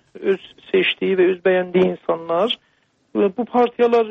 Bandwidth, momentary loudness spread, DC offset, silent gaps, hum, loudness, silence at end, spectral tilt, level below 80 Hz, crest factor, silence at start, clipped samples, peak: 6 kHz; 7 LU; under 0.1%; none; none; -19 LUFS; 0 s; -7.5 dB/octave; -64 dBFS; 14 dB; 0.15 s; under 0.1%; -4 dBFS